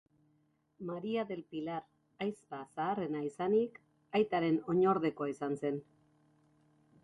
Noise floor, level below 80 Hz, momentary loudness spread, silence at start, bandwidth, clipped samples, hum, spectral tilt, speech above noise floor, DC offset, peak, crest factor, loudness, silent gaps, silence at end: -74 dBFS; -76 dBFS; 13 LU; 0.8 s; 11.5 kHz; under 0.1%; none; -7.5 dB/octave; 40 dB; under 0.1%; -18 dBFS; 18 dB; -35 LUFS; none; 1.2 s